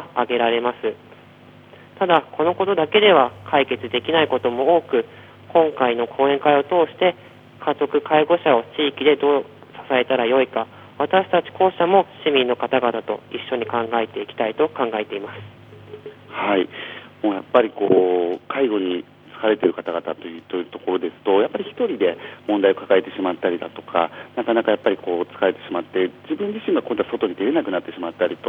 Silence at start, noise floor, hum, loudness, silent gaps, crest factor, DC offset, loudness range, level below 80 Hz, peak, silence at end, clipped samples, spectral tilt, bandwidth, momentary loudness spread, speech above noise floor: 0 s; -46 dBFS; none; -20 LUFS; none; 20 dB; under 0.1%; 5 LU; -70 dBFS; 0 dBFS; 0 s; under 0.1%; -7.5 dB/octave; 4.1 kHz; 11 LU; 26 dB